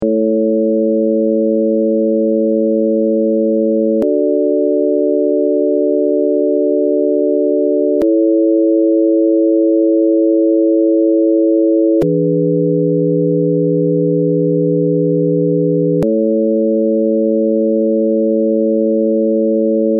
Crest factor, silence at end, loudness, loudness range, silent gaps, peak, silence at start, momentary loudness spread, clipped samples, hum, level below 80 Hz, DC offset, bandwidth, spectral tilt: 8 dB; 0 s; -13 LUFS; 2 LU; none; -4 dBFS; 0 s; 2 LU; under 0.1%; none; -56 dBFS; under 0.1%; 1.7 kHz; -11 dB/octave